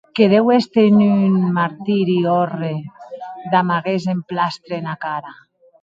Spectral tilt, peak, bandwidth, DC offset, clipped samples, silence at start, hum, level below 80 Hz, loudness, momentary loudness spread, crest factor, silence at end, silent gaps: -8 dB/octave; 0 dBFS; 7.4 kHz; under 0.1%; under 0.1%; 0.15 s; none; -64 dBFS; -17 LUFS; 15 LU; 16 dB; 0.5 s; none